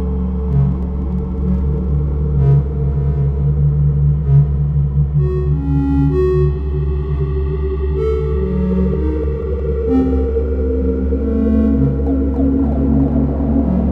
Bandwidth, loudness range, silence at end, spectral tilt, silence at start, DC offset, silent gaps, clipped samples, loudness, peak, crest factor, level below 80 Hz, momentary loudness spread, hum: 3.5 kHz; 2 LU; 0 s; -12 dB/octave; 0 s; under 0.1%; none; under 0.1%; -16 LUFS; -2 dBFS; 14 dB; -20 dBFS; 5 LU; none